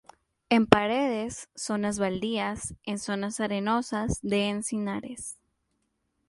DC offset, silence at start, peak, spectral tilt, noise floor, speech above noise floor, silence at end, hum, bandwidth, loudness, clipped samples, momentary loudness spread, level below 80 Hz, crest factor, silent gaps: under 0.1%; 0.5 s; -2 dBFS; -4.5 dB/octave; -76 dBFS; 49 dB; 0.95 s; none; 11.5 kHz; -28 LUFS; under 0.1%; 14 LU; -52 dBFS; 28 dB; none